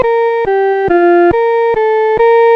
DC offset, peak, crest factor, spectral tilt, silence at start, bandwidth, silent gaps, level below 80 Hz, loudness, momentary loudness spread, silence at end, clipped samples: under 0.1%; -2 dBFS; 8 dB; -7.5 dB/octave; 0 s; 5.6 kHz; none; -40 dBFS; -10 LUFS; 4 LU; 0 s; under 0.1%